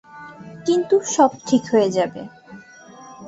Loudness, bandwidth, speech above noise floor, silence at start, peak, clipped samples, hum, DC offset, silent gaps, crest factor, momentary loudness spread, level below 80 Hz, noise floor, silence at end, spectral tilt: -19 LUFS; 8.2 kHz; 25 dB; 0.15 s; -2 dBFS; under 0.1%; none; under 0.1%; none; 18 dB; 22 LU; -64 dBFS; -43 dBFS; 0 s; -4.5 dB/octave